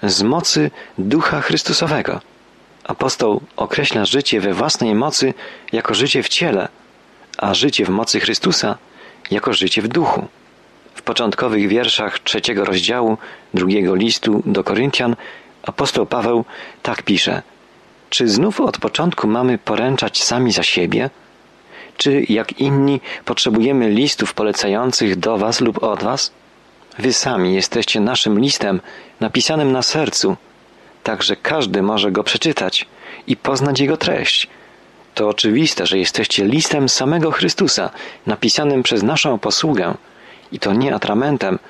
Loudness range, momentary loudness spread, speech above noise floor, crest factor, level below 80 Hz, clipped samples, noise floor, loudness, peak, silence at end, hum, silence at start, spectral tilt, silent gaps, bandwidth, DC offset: 3 LU; 9 LU; 31 dB; 14 dB; -54 dBFS; under 0.1%; -48 dBFS; -16 LUFS; -2 dBFS; 0.1 s; none; 0 s; -4 dB/octave; none; 12.5 kHz; under 0.1%